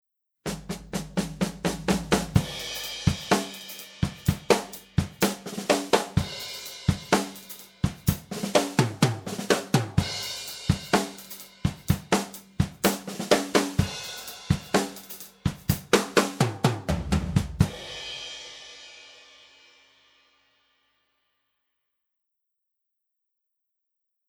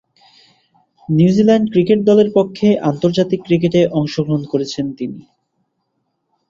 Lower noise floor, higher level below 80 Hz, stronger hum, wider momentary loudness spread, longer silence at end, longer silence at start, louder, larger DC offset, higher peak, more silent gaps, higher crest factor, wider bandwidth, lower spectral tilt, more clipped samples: first, -81 dBFS vs -70 dBFS; first, -44 dBFS vs -54 dBFS; neither; about the same, 13 LU vs 11 LU; first, 5.15 s vs 1.3 s; second, 0.45 s vs 1.1 s; second, -27 LUFS vs -15 LUFS; neither; about the same, -2 dBFS vs -2 dBFS; neither; first, 26 dB vs 14 dB; first, over 20 kHz vs 7.6 kHz; second, -5 dB/octave vs -7.5 dB/octave; neither